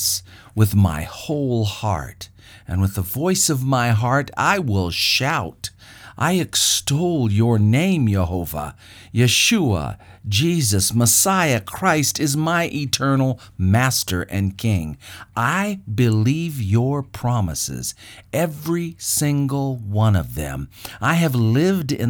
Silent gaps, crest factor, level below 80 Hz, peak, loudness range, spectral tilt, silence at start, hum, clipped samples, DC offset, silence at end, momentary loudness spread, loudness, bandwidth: none; 18 dB; -42 dBFS; -2 dBFS; 4 LU; -4.5 dB/octave; 0 s; none; under 0.1%; under 0.1%; 0 s; 12 LU; -19 LUFS; over 20 kHz